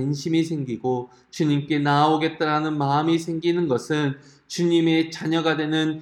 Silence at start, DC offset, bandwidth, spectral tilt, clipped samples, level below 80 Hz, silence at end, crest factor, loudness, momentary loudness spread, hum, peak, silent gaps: 0 s; under 0.1%; 12 kHz; -6 dB/octave; under 0.1%; -66 dBFS; 0 s; 16 dB; -22 LUFS; 8 LU; none; -6 dBFS; none